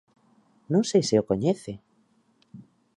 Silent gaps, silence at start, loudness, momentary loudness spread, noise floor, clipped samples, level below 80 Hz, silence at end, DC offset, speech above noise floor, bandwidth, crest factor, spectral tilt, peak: none; 0.7 s; -24 LUFS; 16 LU; -65 dBFS; under 0.1%; -62 dBFS; 0.35 s; under 0.1%; 42 dB; 11.5 kHz; 18 dB; -6 dB/octave; -10 dBFS